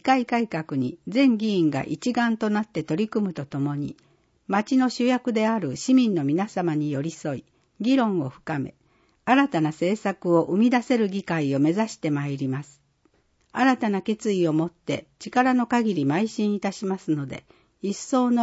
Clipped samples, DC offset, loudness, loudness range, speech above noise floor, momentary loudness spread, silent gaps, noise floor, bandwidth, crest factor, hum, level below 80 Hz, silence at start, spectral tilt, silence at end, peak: under 0.1%; under 0.1%; -24 LUFS; 3 LU; 42 dB; 10 LU; none; -65 dBFS; 8 kHz; 18 dB; none; -66 dBFS; 0.05 s; -6 dB/octave; 0 s; -6 dBFS